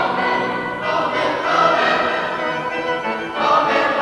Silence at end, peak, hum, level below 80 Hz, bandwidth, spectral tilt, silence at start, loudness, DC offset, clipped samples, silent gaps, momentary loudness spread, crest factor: 0 s; -2 dBFS; none; -54 dBFS; 12 kHz; -4.5 dB/octave; 0 s; -18 LUFS; under 0.1%; under 0.1%; none; 7 LU; 16 dB